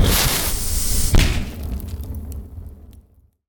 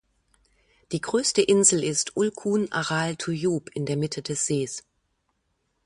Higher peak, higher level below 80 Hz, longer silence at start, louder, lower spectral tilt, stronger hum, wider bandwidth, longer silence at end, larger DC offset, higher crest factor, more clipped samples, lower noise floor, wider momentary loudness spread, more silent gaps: about the same, -4 dBFS vs -4 dBFS; first, -24 dBFS vs -64 dBFS; second, 0 s vs 0.9 s; first, -21 LUFS vs -24 LUFS; about the same, -3.5 dB/octave vs -3.5 dB/octave; neither; first, over 20 kHz vs 11.5 kHz; second, 0.5 s vs 1.05 s; neither; second, 16 dB vs 22 dB; neither; second, -51 dBFS vs -74 dBFS; first, 19 LU vs 11 LU; neither